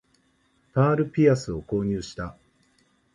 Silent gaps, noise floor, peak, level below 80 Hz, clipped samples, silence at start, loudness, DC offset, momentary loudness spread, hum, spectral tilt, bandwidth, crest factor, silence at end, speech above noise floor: none; -66 dBFS; -6 dBFS; -50 dBFS; under 0.1%; 0.75 s; -24 LUFS; under 0.1%; 15 LU; none; -7.5 dB/octave; 11 kHz; 20 dB; 0.85 s; 43 dB